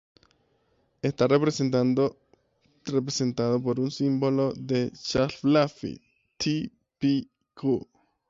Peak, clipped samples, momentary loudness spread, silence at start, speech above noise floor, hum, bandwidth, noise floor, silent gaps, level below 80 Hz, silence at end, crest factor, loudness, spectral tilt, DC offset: -10 dBFS; under 0.1%; 9 LU; 1.05 s; 44 dB; none; 7.8 kHz; -69 dBFS; none; -60 dBFS; 0.5 s; 18 dB; -26 LUFS; -6 dB/octave; under 0.1%